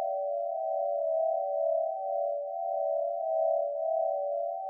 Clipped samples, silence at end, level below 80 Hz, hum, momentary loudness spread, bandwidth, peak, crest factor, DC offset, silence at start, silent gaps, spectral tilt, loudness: under 0.1%; 0 s; under -90 dBFS; none; 3 LU; 0.9 kHz; -18 dBFS; 12 dB; under 0.1%; 0 s; none; 24 dB/octave; -31 LUFS